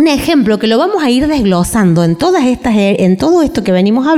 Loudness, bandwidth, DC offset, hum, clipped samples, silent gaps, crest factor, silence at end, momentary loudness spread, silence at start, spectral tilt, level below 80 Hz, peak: -11 LUFS; 16 kHz; 0.2%; none; under 0.1%; none; 8 dB; 0 s; 2 LU; 0 s; -6 dB/octave; -34 dBFS; -2 dBFS